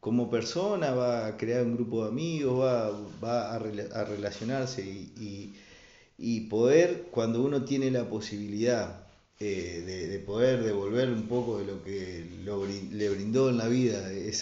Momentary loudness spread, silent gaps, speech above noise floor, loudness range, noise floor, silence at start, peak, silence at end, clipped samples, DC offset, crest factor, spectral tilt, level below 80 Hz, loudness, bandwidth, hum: 11 LU; none; 26 dB; 4 LU; -56 dBFS; 0.05 s; -10 dBFS; 0 s; under 0.1%; under 0.1%; 18 dB; -6 dB/octave; -62 dBFS; -30 LUFS; 7.8 kHz; none